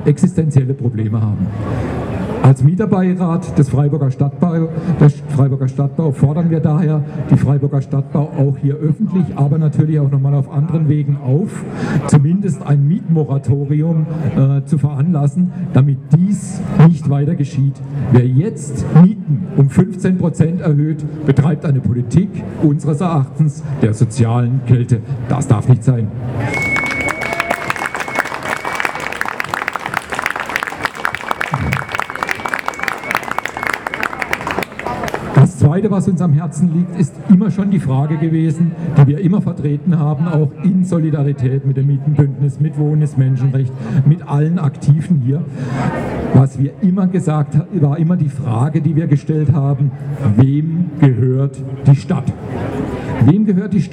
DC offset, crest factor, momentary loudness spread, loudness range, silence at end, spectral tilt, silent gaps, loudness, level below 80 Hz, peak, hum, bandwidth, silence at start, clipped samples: under 0.1%; 14 dB; 8 LU; 5 LU; 0 s; -8 dB/octave; none; -15 LUFS; -42 dBFS; 0 dBFS; none; 11 kHz; 0 s; under 0.1%